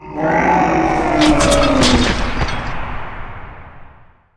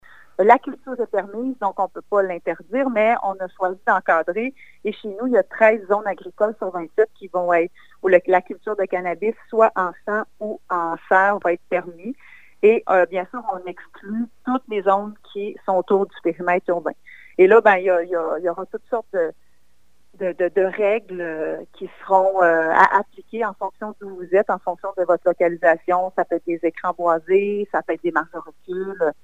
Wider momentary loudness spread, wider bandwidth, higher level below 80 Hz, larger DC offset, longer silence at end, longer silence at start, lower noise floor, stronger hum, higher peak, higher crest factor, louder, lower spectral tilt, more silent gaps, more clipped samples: first, 18 LU vs 14 LU; first, 10.5 kHz vs 8 kHz; first, -26 dBFS vs -66 dBFS; second, under 0.1% vs 0.4%; first, 0.5 s vs 0.1 s; second, 0 s vs 0.4 s; second, -43 dBFS vs -65 dBFS; neither; about the same, -2 dBFS vs 0 dBFS; second, 14 dB vs 20 dB; first, -14 LUFS vs -20 LUFS; second, -4.5 dB/octave vs -7 dB/octave; neither; neither